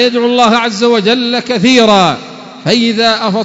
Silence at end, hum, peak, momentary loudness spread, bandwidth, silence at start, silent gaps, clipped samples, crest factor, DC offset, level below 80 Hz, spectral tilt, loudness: 0 s; none; 0 dBFS; 6 LU; 8 kHz; 0 s; none; 0.2%; 10 dB; under 0.1%; -52 dBFS; -4.5 dB/octave; -9 LUFS